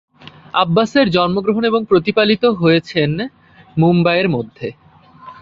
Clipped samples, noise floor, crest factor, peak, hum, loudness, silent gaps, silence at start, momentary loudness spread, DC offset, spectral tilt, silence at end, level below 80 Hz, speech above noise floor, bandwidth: under 0.1%; -40 dBFS; 16 dB; 0 dBFS; none; -15 LUFS; none; 0.25 s; 12 LU; under 0.1%; -7.5 dB/octave; 0.1 s; -52 dBFS; 25 dB; 7.4 kHz